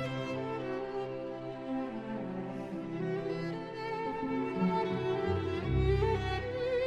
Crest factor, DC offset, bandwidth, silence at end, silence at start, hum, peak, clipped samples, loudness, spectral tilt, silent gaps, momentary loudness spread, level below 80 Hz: 16 dB; under 0.1%; 10 kHz; 0 s; 0 s; none; -18 dBFS; under 0.1%; -35 LUFS; -8 dB/octave; none; 9 LU; -46 dBFS